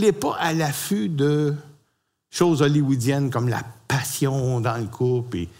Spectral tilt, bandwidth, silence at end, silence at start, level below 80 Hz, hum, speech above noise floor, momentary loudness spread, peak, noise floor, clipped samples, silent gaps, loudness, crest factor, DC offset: -6 dB/octave; 16 kHz; 0.1 s; 0 s; -58 dBFS; none; 49 dB; 7 LU; -4 dBFS; -70 dBFS; under 0.1%; none; -22 LUFS; 18 dB; under 0.1%